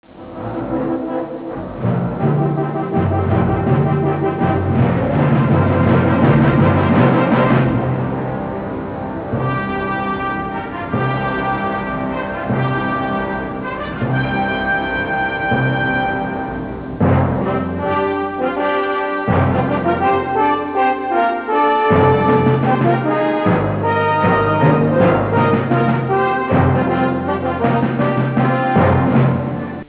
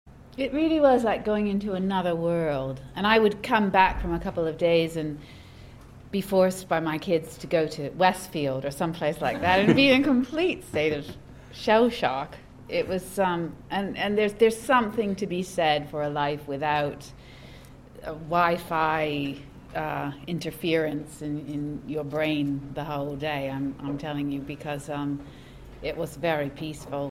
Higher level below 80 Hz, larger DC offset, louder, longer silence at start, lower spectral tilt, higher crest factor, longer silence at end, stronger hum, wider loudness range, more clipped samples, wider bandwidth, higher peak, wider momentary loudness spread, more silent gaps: first, -34 dBFS vs -50 dBFS; neither; first, -17 LUFS vs -26 LUFS; about the same, 0.15 s vs 0.05 s; first, -11.5 dB/octave vs -5.5 dB/octave; second, 14 dB vs 22 dB; about the same, 0.05 s vs 0 s; neither; about the same, 6 LU vs 7 LU; neither; second, 4 kHz vs 16.5 kHz; about the same, -2 dBFS vs -4 dBFS; second, 9 LU vs 13 LU; neither